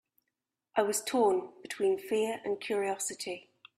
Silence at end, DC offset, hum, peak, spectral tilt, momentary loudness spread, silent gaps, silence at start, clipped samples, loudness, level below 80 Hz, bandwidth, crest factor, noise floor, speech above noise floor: 0.4 s; under 0.1%; none; -12 dBFS; -3 dB/octave; 12 LU; none; 0.75 s; under 0.1%; -32 LUFS; -78 dBFS; 15.5 kHz; 20 dB; -87 dBFS; 56 dB